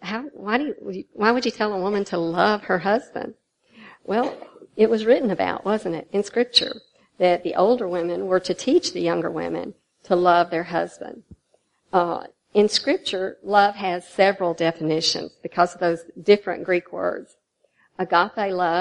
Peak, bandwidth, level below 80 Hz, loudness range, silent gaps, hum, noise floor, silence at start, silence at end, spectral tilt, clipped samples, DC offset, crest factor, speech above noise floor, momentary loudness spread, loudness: -2 dBFS; 11 kHz; -66 dBFS; 3 LU; none; none; -66 dBFS; 0 s; 0 s; -4.5 dB/octave; under 0.1%; under 0.1%; 20 dB; 45 dB; 12 LU; -22 LUFS